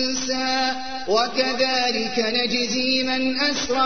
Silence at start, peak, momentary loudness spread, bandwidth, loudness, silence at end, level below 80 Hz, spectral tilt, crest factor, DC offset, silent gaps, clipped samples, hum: 0 s; -6 dBFS; 3 LU; 6.6 kHz; -21 LUFS; 0 s; -52 dBFS; -2 dB/octave; 16 dB; 2%; none; under 0.1%; none